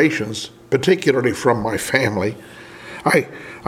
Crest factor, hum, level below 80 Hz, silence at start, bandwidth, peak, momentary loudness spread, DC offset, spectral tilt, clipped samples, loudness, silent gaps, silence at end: 20 dB; none; -52 dBFS; 0 s; 16.5 kHz; 0 dBFS; 18 LU; under 0.1%; -5 dB/octave; under 0.1%; -19 LUFS; none; 0 s